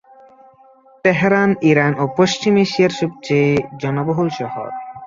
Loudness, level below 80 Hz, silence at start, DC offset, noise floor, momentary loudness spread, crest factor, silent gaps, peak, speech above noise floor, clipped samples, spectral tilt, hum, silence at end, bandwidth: -17 LUFS; -54 dBFS; 1.05 s; under 0.1%; -49 dBFS; 10 LU; 16 dB; none; -2 dBFS; 32 dB; under 0.1%; -6 dB/octave; none; 0 s; 7.6 kHz